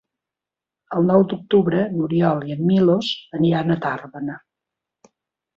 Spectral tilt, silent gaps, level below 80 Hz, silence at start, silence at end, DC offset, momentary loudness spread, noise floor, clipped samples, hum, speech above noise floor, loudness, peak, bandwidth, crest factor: -8 dB/octave; none; -60 dBFS; 0.9 s; 1.2 s; under 0.1%; 12 LU; -88 dBFS; under 0.1%; none; 69 dB; -19 LUFS; -4 dBFS; 7.2 kHz; 18 dB